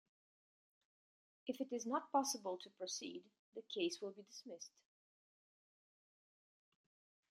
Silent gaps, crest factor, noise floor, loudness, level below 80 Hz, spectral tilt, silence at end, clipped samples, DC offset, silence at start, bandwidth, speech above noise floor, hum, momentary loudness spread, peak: 3.39-3.52 s; 24 dB; under -90 dBFS; -44 LUFS; under -90 dBFS; -2 dB/octave; 2.65 s; under 0.1%; under 0.1%; 1.45 s; 13.5 kHz; over 45 dB; none; 17 LU; -24 dBFS